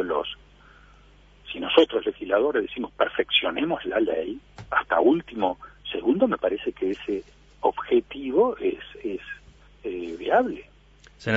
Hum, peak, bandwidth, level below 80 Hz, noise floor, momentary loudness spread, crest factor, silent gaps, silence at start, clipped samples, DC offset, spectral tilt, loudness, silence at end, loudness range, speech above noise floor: none; -4 dBFS; 7.6 kHz; -54 dBFS; -53 dBFS; 14 LU; 22 dB; none; 0 s; under 0.1%; under 0.1%; -6 dB/octave; -25 LUFS; 0 s; 3 LU; 29 dB